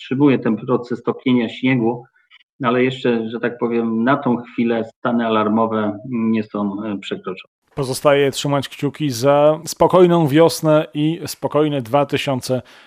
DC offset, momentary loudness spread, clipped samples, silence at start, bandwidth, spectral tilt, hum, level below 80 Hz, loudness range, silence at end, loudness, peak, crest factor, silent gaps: under 0.1%; 10 LU; under 0.1%; 0 s; 15.5 kHz; -6 dB/octave; none; -58 dBFS; 5 LU; 0.25 s; -18 LUFS; 0 dBFS; 18 dB; 2.43-2.59 s, 4.96-5.02 s, 7.47-7.62 s